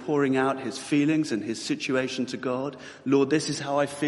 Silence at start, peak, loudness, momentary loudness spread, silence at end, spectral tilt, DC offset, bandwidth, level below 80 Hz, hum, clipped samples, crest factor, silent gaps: 0 s; -10 dBFS; -26 LUFS; 8 LU; 0 s; -5 dB/octave; under 0.1%; 11.5 kHz; -70 dBFS; none; under 0.1%; 16 dB; none